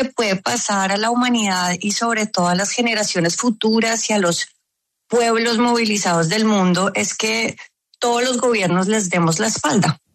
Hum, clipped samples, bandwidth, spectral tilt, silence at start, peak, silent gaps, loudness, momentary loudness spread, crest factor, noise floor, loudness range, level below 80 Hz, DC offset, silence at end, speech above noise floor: none; under 0.1%; 13.5 kHz; -3.5 dB/octave; 0 s; -6 dBFS; none; -18 LUFS; 3 LU; 14 dB; -76 dBFS; 1 LU; -62 dBFS; under 0.1%; 0.2 s; 58 dB